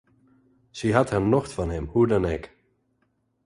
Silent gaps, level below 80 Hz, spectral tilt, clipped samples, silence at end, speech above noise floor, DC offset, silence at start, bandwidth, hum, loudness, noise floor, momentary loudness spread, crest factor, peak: none; -42 dBFS; -7 dB/octave; under 0.1%; 1 s; 48 dB; under 0.1%; 0.75 s; 11.5 kHz; none; -24 LUFS; -71 dBFS; 9 LU; 22 dB; -4 dBFS